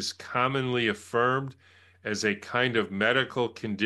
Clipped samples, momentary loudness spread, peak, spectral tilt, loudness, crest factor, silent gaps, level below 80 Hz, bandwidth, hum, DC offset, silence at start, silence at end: under 0.1%; 6 LU; -8 dBFS; -4.5 dB/octave; -27 LUFS; 20 dB; none; -70 dBFS; 12.5 kHz; none; under 0.1%; 0 s; 0 s